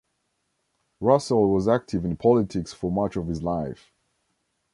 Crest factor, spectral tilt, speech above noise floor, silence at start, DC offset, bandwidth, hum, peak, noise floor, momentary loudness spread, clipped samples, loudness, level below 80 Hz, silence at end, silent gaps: 20 dB; -7.5 dB/octave; 52 dB; 1 s; under 0.1%; 11.5 kHz; none; -4 dBFS; -75 dBFS; 9 LU; under 0.1%; -24 LUFS; -48 dBFS; 1 s; none